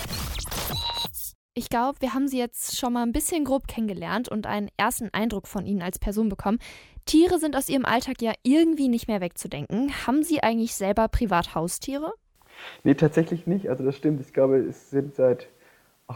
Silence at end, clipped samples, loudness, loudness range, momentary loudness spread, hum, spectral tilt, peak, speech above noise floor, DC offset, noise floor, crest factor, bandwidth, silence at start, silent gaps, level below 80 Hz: 0 s; under 0.1%; -25 LUFS; 4 LU; 10 LU; none; -5 dB/octave; -6 dBFS; 34 dB; under 0.1%; -59 dBFS; 18 dB; 17.5 kHz; 0 s; 1.35-1.49 s; -42 dBFS